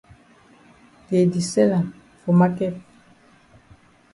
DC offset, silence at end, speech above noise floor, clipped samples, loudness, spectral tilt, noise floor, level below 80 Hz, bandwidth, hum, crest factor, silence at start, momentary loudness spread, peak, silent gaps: under 0.1%; 1.35 s; 35 dB; under 0.1%; -21 LUFS; -7 dB/octave; -54 dBFS; -60 dBFS; 11.5 kHz; none; 18 dB; 1.1 s; 13 LU; -6 dBFS; none